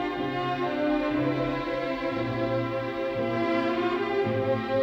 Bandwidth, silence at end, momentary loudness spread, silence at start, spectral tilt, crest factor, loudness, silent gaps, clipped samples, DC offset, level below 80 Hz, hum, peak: 8 kHz; 0 s; 3 LU; 0 s; -7.5 dB/octave; 14 dB; -28 LUFS; none; under 0.1%; under 0.1%; -52 dBFS; none; -14 dBFS